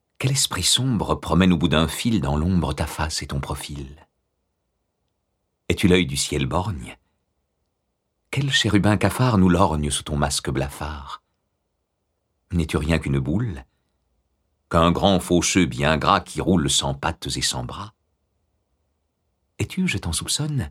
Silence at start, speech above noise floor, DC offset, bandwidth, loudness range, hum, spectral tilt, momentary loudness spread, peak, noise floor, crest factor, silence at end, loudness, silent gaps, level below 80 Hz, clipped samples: 0.2 s; 54 dB; under 0.1%; 16 kHz; 7 LU; none; -4.5 dB/octave; 13 LU; -2 dBFS; -75 dBFS; 22 dB; 0 s; -21 LUFS; none; -38 dBFS; under 0.1%